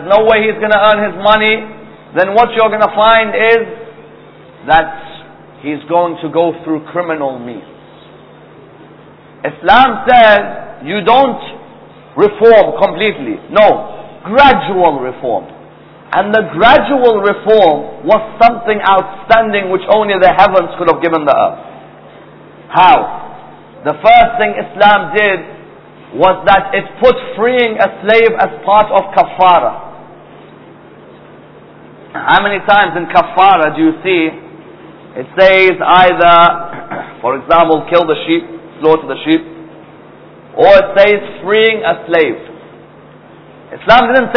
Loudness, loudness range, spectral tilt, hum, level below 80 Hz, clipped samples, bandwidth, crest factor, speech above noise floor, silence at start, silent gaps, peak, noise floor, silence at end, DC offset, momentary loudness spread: -10 LUFS; 6 LU; -7 dB/octave; none; -42 dBFS; 1%; 5.4 kHz; 12 dB; 28 dB; 0 s; none; 0 dBFS; -38 dBFS; 0 s; under 0.1%; 16 LU